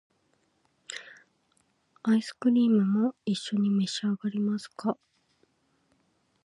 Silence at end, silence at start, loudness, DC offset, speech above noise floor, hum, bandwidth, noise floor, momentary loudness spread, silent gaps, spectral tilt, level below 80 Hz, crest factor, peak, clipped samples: 1.5 s; 0.9 s; -28 LUFS; under 0.1%; 45 dB; none; 11 kHz; -71 dBFS; 17 LU; none; -6 dB/octave; -80 dBFS; 16 dB; -14 dBFS; under 0.1%